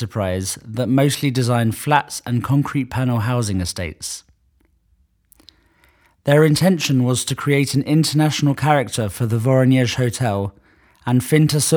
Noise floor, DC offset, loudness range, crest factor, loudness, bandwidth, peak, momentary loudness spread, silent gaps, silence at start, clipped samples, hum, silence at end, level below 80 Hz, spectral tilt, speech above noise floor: -61 dBFS; under 0.1%; 7 LU; 18 dB; -18 LUFS; over 20 kHz; 0 dBFS; 10 LU; none; 0 s; under 0.1%; none; 0 s; -50 dBFS; -5.5 dB/octave; 43 dB